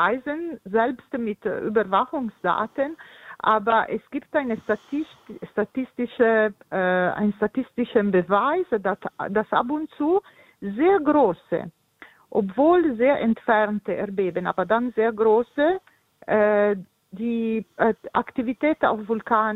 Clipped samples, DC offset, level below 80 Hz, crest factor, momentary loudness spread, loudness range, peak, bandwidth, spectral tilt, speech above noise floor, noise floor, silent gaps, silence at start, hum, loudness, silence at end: under 0.1%; under 0.1%; -60 dBFS; 18 dB; 10 LU; 3 LU; -4 dBFS; 4.1 kHz; -8 dB/octave; 28 dB; -51 dBFS; none; 0 s; none; -23 LUFS; 0 s